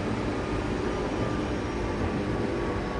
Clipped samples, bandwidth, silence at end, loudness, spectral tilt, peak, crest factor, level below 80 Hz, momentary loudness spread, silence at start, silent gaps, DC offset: under 0.1%; 11.5 kHz; 0 s; -30 LUFS; -6.5 dB/octave; -14 dBFS; 14 dB; -38 dBFS; 1 LU; 0 s; none; under 0.1%